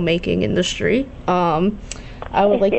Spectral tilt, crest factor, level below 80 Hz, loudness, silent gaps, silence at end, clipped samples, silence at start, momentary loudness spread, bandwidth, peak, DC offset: -5.5 dB/octave; 12 dB; -38 dBFS; -19 LUFS; none; 0 s; under 0.1%; 0 s; 13 LU; 8.4 kHz; -6 dBFS; under 0.1%